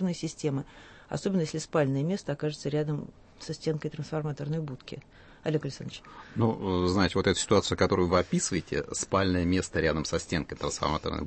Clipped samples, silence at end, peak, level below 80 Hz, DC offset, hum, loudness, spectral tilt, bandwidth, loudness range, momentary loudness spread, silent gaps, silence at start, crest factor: under 0.1%; 0 s; -10 dBFS; -50 dBFS; under 0.1%; none; -29 LUFS; -5 dB/octave; 8.8 kHz; 8 LU; 14 LU; none; 0 s; 20 dB